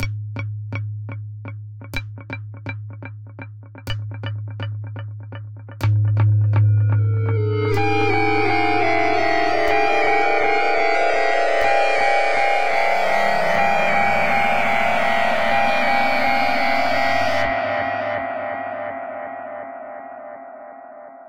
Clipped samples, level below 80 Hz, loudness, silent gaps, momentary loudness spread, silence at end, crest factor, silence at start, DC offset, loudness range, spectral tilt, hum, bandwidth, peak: under 0.1%; -46 dBFS; -19 LUFS; none; 18 LU; 0 s; 14 dB; 0 s; under 0.1%; 14 LU; -6 dB/octave; none; 14.5 kHz; -6 dBFS